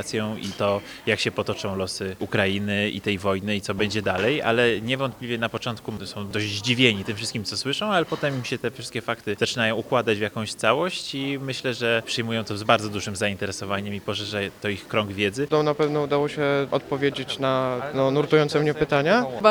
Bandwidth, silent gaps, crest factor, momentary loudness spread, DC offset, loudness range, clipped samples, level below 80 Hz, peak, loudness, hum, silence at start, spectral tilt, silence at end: over 20 kHz; none; 24 dB; 8 LU; under 0.1%; 2 LU; under 0.1%; -58 dBFS; 0 dBFS; -24 LUFS; none; 0 s; -4.5 dB/octave; 0 s